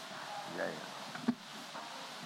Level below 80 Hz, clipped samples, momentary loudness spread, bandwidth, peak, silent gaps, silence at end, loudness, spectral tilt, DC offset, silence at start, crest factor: -86 dBFS; under 0.1%; 6 LU; 16 kHz; -20 dBFS; none; 0 s; -42 LUFS; -3.5 dB/octave; under 0.1%; 0 s; 24 dB